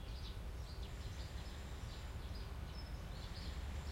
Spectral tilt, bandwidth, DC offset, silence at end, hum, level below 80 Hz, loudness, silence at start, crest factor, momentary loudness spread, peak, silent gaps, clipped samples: -5 dB/octave; 16.5 kHz; under 0.1%; 0 s; none; -48 dBFS; -49 LUFS; 0 s; 12 dB; 2 LU; -36 dBFS; none; under 0.1%